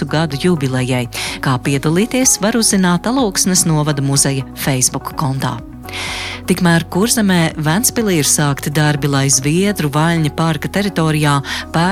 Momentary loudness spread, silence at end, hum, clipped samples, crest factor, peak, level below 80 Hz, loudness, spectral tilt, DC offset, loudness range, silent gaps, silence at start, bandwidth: 8 LU; 0 s; none; under 0.1%; 14 dB; 0 dBFS; -38 dBFS; -15 LUFS; -4 dB/octave; under 0.1%; 3 LU; none; 0 s; 16 kHz